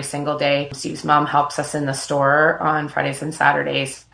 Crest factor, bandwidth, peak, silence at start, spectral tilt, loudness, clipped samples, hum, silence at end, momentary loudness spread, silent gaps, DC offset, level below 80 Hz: 18 dB; 10.5 kHz; 0 dBFS; 0 s; -4.5 dB/octave; -19 LUFS; under 0.1%; none; 0.15 s; 8 LU; none; under 0.1%; -58 dBFS